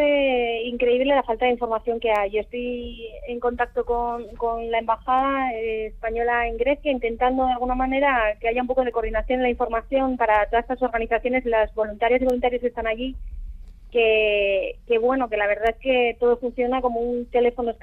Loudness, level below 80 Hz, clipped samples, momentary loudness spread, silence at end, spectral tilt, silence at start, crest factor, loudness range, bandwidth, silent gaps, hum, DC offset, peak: -23 LUFS; -40 dBFS; under 0.1%; 8 LU; 0.05 s; -6.5 dB/octave; 0 s; 16 dB; 3 LU; 4.3 kHz; none; none; under 0.1%; -6 dBFS